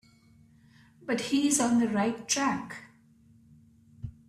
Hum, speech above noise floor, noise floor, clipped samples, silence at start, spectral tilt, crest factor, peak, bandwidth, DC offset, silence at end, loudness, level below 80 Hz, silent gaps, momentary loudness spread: none; 32 dB; -60 dBFS; under 0.1%; 1 s; -3.5 dB/octave; 18 dB; -14 dBFS; 14 kHz; under 0.1%; 0.2 s; -27 LUFS; -62 dBFS; none; 21 LU